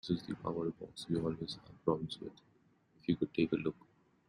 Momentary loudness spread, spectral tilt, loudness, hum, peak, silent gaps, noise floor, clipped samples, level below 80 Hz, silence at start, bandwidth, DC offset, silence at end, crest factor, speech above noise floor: 12 LU; -7 dB/octave; -38 LUFS; none; -16 dBFS; none; -70 dBFS; under 0.1%; -66 dBFS; 0.05 s; 11 kHz; under 0.1%; 0.55 s; 22 dB; 32 dB